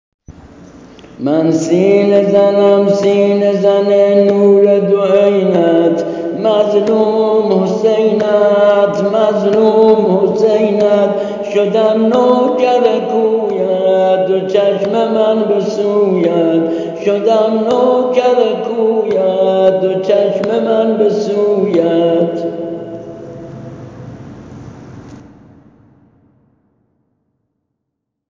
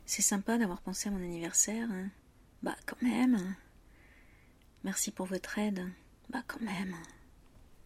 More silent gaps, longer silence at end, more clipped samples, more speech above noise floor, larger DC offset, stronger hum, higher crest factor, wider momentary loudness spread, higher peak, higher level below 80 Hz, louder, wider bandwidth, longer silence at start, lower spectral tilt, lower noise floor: neither; first, 3.15 s vs 0.1 s; neither; first, 64 dB vs 27 dB; neither; neither; second, 12 dB vs 22 dB; second, 10 LU vs 14 LU; first, 0 dBFS vs -14 dBFS; first, -54 dBFS vs -60 dBFS; first, -12 LUFS vs -34 LUFS; second, 7.6 kHz vs 15.5 kHz; first, 0.3 s vs 0 s; first, -7 dB/octave vs -3.5 dB/octave; first, -75 dBFS vs -61 dBFS